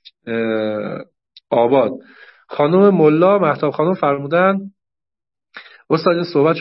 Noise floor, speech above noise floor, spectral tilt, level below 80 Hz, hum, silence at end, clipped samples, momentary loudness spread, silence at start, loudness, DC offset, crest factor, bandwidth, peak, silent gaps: -88 dBFS; 73 dB; -11.5 dB/octave; -66 dBFS; none; 0 s; under 0.1%; 14 LU; 0.25 s; -16 LUFS; under 0.1%; 16 dB; 5.8 kHz; 0 dBFS; none